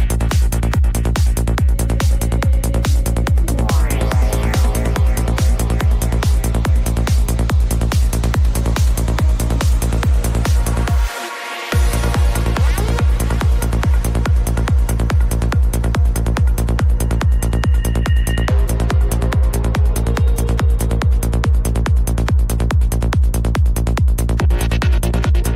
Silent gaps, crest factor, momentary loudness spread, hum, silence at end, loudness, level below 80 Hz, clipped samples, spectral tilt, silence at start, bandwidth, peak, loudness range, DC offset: none; 8 dB; 1 LU; none; 0 s; -17 LUFS; -16 dBFS; under 0.1%; -6 dB/octave; 0 s; 16 kHz; -6 dBFS; 1 LU; under 0.1%